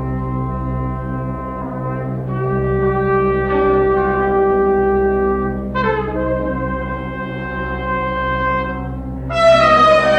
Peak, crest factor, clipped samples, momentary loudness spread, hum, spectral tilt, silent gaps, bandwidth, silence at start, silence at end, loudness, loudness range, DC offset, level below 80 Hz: -2 dBFS; 16 dB; under 0.1%; 12 LU; none; -7 dB/octave; none; 8.6 kHz; 0 s; 0 s; -17 LUFS; 5 LU; under 0.1%; -30 dBFS